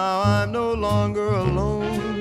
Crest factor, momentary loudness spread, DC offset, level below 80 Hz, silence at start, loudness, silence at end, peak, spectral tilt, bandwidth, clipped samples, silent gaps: 14 dB; 4 LU; under 0.1%; -36 dBFS; 0 s; -22 LUFS; 0 s; -8 dBFS; -7 dB/octave; 13.5 kHz; under 0.1%; none